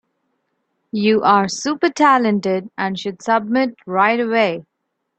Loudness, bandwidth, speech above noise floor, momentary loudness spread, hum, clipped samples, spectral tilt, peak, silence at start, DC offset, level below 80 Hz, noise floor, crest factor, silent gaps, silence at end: -17 LUFS; 8.6 kHz; 58 dB; 9 LU; none; under 0.1%; -5 dB/octave; -2 dBFS; 0.95 s; under 0.1%; -64 dBFS; -74 dBFS; 16 dB; none; 0.55 s